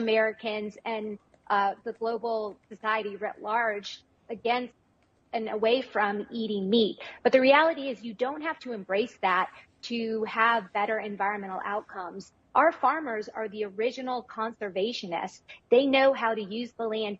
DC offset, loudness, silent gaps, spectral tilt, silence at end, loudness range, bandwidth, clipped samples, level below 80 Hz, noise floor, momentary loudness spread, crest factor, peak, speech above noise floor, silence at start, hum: under 0.1%; -28 LUFS; none; -5 dB/octave; 0.05 s; 5 LU; 7.8 kHz; under 0.1%; -74 dBFS; -67 dBFS; 13 LU; 20 dB; -8 dBFS; 39 dB; 0 s; none